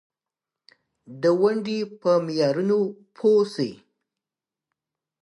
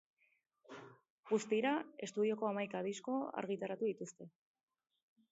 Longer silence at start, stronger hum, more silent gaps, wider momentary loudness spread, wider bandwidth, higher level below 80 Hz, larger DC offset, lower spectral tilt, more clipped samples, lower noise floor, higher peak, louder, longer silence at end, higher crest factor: first, 1.1 s vs 0.7 s; neither; second, none vs 1.10-1.23 s; second, 9 LU vs 20 LU; first, 11 kHz vs 7.6 kHz; first, -76 dBFS vs under -90 dBFS; neither; first, -6.5 dB/octave vs -4.5 dB/octave; neither; about the same, -90 dBFS vs under -90 dBFS; first, -8 dBFS vs -22 dBFS; first, -23 LUFS vs -39 LUFS; first, 1.45 s vs 1.05 s; about the same, 16 dB vs 18 dB